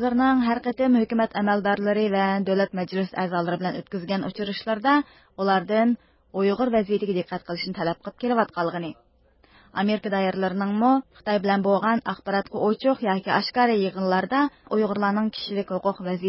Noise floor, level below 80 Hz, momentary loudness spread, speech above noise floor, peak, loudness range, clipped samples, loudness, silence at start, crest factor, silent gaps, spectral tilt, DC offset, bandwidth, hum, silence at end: -58 dBFS; -60 dBFS; 8 LU; 35 dB; -8 dBFS; 3 LU; under 0.1%; -24 LUFS; 0 s; 16 dB; none; -10.5 dB/octave; under 0.1%; 5.8 kHz; none; 0 s